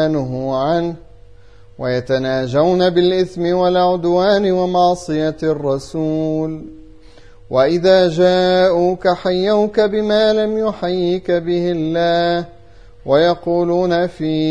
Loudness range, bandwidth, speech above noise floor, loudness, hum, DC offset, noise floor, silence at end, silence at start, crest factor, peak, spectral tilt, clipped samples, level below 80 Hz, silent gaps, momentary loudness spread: 3 LU; 10 kHz; 29 dB; -16 LUFS; none; 0.7%; -44 dBFS; 0 s; 0 s; 16 dB; 0 dBFS; -6.5 dB/octave; under 0.1%; -46 dBFS; none; 7 LU